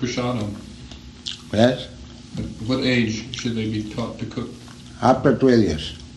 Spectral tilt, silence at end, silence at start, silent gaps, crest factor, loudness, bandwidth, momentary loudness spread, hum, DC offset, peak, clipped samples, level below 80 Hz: -6 dB/octave; 0 s; 0 s; none; 20 dB; -22 LUFS; 11.5 kHz; 20 LU; none; under 0.1%; -2 dBFS; under 0.1%; -44 dBFS